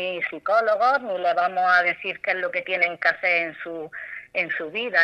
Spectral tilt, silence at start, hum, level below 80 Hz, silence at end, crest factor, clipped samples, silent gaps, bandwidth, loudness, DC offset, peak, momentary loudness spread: -4 dB/octave; 0 s; none; -72 dBFS; 0 s; 18 dB; under 0.1%; none; 8.6 kHz; -22 LUFS; under 0.1%; -4 dBFS; 12 LU